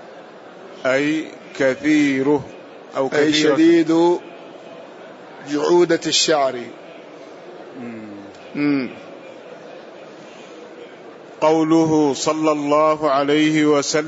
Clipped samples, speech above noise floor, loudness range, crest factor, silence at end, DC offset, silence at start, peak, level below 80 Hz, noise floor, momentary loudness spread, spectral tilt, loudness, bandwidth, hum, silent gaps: under 0.1%; 23 dB; 11 LU; 16 dB; 0 s; under 0.1%; 0 s; -4 dBFS; -66 dBFS; -39 dBFS; 23 LU; -4 dB/octave; -17 LUFS; 8 kHz; none; none